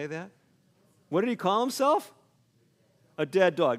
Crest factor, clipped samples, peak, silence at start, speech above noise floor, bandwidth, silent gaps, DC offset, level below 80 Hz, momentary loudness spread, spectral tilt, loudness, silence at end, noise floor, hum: 20 dB; under 0.1%; -8 dBFS; 0 s; 40 dB; 16 kHz; none; under 0.1%; -80 dBFS; 21 LU; -5 dB/octave; -27 LUFS; 0 s; -67 dBFS; none